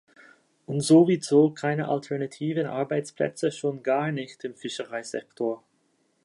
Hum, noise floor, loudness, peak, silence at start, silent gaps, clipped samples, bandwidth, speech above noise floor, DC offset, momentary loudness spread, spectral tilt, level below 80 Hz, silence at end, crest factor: none; -69 dBFS; -26 LUFS; -8 dBFS; 0.7 s; none; under 0.1%; 11.5 kHz; 44 dB; under 0.1%; 15 LU; -6 dB/octave; -76 dBFS; 0.65 s; 18 dB